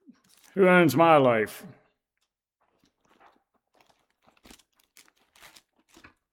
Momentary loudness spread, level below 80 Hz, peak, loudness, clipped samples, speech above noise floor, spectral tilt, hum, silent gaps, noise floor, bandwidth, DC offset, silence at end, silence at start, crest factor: 17 LU; -74 dBFS; -6 dBFS; -21 LUFS; under 0.1%; 61 dB; -6.5 dB/octave; none; none; -81 dBFS; 16.5 kHz; under 0.1%; 4.65 s; 0.55 s; 22 dB